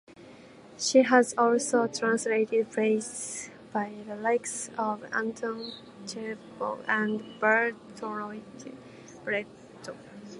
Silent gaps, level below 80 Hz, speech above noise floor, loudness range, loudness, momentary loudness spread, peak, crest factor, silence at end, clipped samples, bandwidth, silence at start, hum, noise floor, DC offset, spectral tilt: none; -74 dBFS; 22 dB; 7 LU; -28 LUFS; 20 LU; -6 dBFS; 22 dB; 0 s; under 0.1%; 11.5 kHz; 0.1 s; none; -50 dBFS; under 0.1%; -3.5 dB/octave